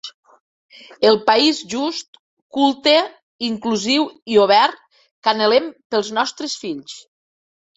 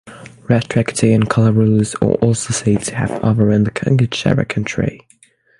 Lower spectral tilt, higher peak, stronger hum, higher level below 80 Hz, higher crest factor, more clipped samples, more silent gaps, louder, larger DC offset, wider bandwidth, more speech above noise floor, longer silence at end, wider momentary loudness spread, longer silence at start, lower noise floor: second, -3 dB/octave vs -6 dB/octave; about the same, -2 dBFS vs 0 dBFS; neither; second, -66 dBFS vs -42 dBFS; about the same, 18 dB vs 16 dB; neither; first, 0.14-0.23 s, 0.40-0.69 s, 2.08-2.13 s, 2.19-2.50 s, 3.23-3.39 s, 4.22-4.26 s, 5.11-5.22 s, 5.85-5.90 s vs none; about the same, -18 LUFS vs -16 LUFS; neither; second, 8 kHz vs 11.5 kHz; first, over 72 dB vs 37 dB; about the same, 0.75 s vs 0.65 s; first, 15 LU vs 7 LU; about the same, 0.05 s vs 0.05 s; first, under -90 dBFS vs -52 dBFS